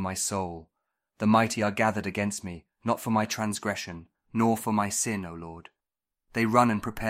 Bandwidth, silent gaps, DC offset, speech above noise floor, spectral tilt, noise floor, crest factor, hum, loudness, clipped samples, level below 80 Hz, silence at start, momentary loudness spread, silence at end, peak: 16 kHz; none; under 0.1%; 62 dB; -4.5 dB/octave; -89 dBFS; 22 dB; none; -27 LUFS; under 0.1%; -56 dBFS; 0 s; 17 LU; 0 s; -6 dBFS